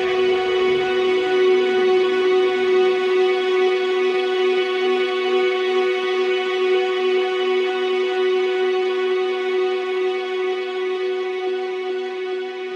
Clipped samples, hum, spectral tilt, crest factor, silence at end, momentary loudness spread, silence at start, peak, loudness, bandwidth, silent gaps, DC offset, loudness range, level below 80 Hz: under 0.1%; none; -4 dB/octave; 12 dB; 0 s; 6 LU; 0 s; -8 dBFS; -20 LUFS; 7.8 kHz; none; under 0.1%; 4 LU; -64 dBFS